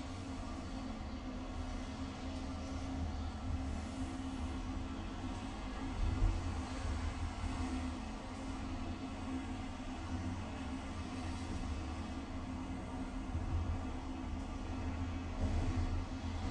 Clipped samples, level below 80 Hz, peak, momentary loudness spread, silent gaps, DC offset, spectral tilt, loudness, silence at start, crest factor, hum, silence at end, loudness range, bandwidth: under 0.1%; -44 dBFS; -22 dBFS; 5 LU; none; under 0.1%; -6 dB/octave; -42 LUFS; 0 s; 18 dB; none; 0 s; 2 LU; 11 kHz